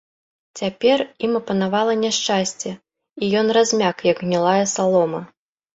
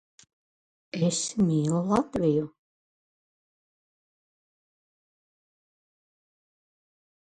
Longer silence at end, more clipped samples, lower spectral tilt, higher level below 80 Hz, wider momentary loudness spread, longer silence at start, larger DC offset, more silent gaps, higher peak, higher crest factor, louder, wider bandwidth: second, 0.5 s vs 4.9 s; neither; second, -4 dB/octave vs -6 dB/octave; about the same, -62 dBFS vs -62 dBFS; first, 11 LU vs 7 LU; second, 0.55 s vs 0.95 s; neither; neither; first, -4 dBFS vs -10 dBFS; second, 16 dB vs 22 dB; first, -19 LUFS vs -26 LUFS; second, 8.2 kHz vs 10.5 kHz